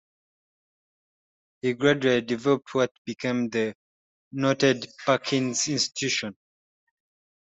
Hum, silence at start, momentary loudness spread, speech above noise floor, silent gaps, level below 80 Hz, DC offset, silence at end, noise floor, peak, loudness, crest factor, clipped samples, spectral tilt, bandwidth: none; 1.65 s; 8 LU; over 65 dB; 2.91-3.05 s, 3.75-4.31 s; -68 dBFS; under 0.1%; 1.1 s; under -90 dBFS; -6 dBFS; -25 LUFS; 20 dB; under 0.1%; -4 dB/octave; 8.2 kHz